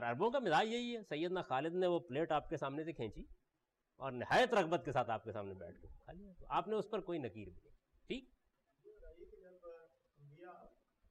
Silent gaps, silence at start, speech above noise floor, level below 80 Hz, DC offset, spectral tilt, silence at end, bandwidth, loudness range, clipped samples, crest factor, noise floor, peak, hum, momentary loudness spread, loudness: none; 0 s; 47 dB; -64 dBFS; under 0.1%; -5.5 dB/octave; 0.45 s; 12 kHz; 17 LU; under 0.1%; 16 dB; -87 dBFS; -24 dBFS; none; 24 LU; -39 LUFS